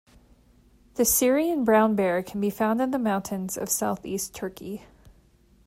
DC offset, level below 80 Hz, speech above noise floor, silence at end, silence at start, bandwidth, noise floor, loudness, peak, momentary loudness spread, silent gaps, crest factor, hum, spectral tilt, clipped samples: under 0.1%; -56 dBFS; 34 dB; 0.55 s; 0.95 s; 16 kHz; -59 dBFS; -25 LUFS; -8 dBFS; 15 LU; none; 18 dB; none; -4 dB/octave; under 0.1%